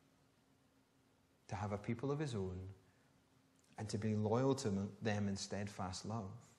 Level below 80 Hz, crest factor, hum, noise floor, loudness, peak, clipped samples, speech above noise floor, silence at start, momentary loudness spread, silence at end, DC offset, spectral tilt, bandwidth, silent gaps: -74 dBFS; 20 dB; none; -74 dBFS; -42 LUFS; -24 dBFS; under 0.1%; 33 dB; 1.5 s; 13 LU; 0.1 s; under 0.1%; -6 dB/octave; 12 kHz; none